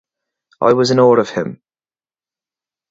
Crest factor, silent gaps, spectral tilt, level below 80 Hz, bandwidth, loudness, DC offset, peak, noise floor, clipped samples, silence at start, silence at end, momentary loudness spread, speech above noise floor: 18 dB; none; -6 dB/octave; -60 dBFS; 8 kHz; -14 LUFS; under 0.1%; 0 dBFS; under -90 dBFS; under 0.1%; 0.6 s; 1.35 s; 12 LU; over 77 dB